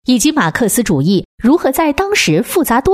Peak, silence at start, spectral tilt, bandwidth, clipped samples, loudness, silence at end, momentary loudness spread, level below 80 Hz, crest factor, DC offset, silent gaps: 0 dBFS; 0.1 s; -4.5 dB/octave; 16 kHz; under 0.1%; -13 LUFS; 0 s; 2 LU; -36 dBFS; 12 dB; under 0.1%; 1.25-1.38 s